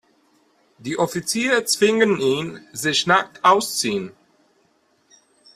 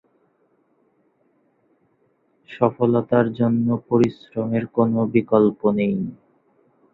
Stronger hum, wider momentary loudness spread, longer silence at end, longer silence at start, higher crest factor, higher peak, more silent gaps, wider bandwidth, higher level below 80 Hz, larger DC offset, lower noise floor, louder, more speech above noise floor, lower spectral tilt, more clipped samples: neither; first, 12 LU vs 7 LU; first, 1.45 s vs 0.8 s; second, 0.8 s vs 2.5 s; about the same, 20 dB vs 20 dB; about the same, -2 dBFS vs -2 dBFS; neither; first, 15.5 kHz vs 6.8 kHz; about the same, -64 dBFS vs -60 dBFS; neither; about the same, -63 dBFS vs -64 dBFS; about the same, -19 LUFS vs -20 LUFS; about the same, 43 dB vs 45 dB; second, -3 dB/octave vs -9.5 dB/octave; neither